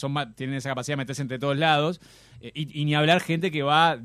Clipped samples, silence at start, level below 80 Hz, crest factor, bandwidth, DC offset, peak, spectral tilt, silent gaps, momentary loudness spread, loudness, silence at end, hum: under 0.1%; 0 s; -62 dBFS; 18 dB; 14 kHz; under 0.1%; -6 dBFS; -5.5 dB/octave; none; 14 LU; -25 LUFS; 0 s; none